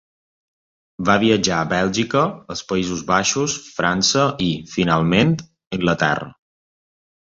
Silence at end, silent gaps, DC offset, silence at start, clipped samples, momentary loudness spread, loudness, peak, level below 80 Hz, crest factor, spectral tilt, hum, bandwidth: 0.95 s; 5.67-5.71 s; under 0.1%; 1 s; under 0.1%; 8 LU; -19 LUFS; -2 dBFS; -48 dBFS; 18 dB; -4 dB/octave; none; 7.8 kHz